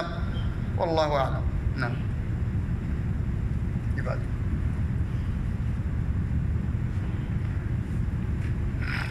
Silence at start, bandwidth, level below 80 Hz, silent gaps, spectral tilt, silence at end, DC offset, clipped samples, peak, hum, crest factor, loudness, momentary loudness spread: 0 s; 11 kHz; -32 dBFS; none; -8 dB/octave; 0 s; under 0.1%; under 0.1%; -12 dBFS; none; 16 dB; -29 LUFS; 4 LU